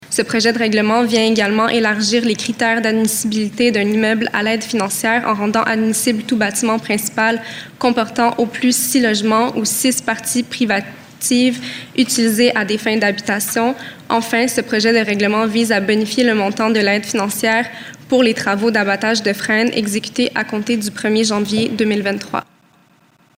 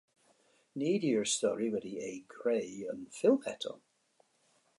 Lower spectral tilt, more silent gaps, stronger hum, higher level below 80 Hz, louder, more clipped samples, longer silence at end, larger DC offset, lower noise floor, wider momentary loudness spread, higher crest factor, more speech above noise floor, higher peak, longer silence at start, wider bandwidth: about the same, -3.5 dB/octave vs -4 dB/octave; neither; neither; first, -58 dBFS vs -80 dBFS; first, -16 LUFS vs -34 LUFS; neither; about the same, 0.95 s vs 1 s; neither; second, -53 dBFS vs -72 dBFS; second, 5 LU vs 13 LU; second, 14 dB vs 20 dB; about the same, 37 dB vs 39 dB; first, -2 dBFS vs -16 dBFS; second, 0 s vs 0.75 s; first, 16 kHz vs 11.5 kHz